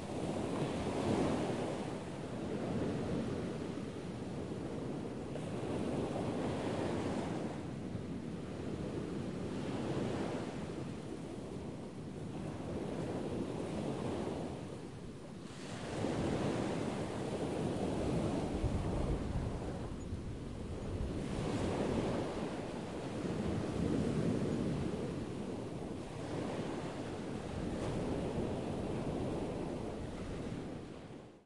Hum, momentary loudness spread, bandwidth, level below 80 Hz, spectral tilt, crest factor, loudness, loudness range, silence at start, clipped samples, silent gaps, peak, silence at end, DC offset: none; 8 LU; 11.5 kHz; -52 dBFS; -7 dB/octave; 18 dB; -40 LUFS; 4 LU; 0 s; under 0.1%; none; -22 dBFS; 0 s; 0.1%